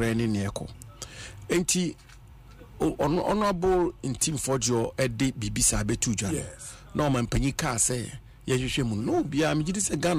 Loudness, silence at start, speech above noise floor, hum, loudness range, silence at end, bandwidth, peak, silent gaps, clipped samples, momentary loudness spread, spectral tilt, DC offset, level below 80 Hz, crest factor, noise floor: -27 LUFS; 0 s; 22 dB; none; 3 LU; 0 s; 15.5 kHz; -12 dBFS; none; under 0.1%; 15 LU; -4.5 dB/octave; under 0.1%; -42 dBFS; 16 dB; -48 dBFS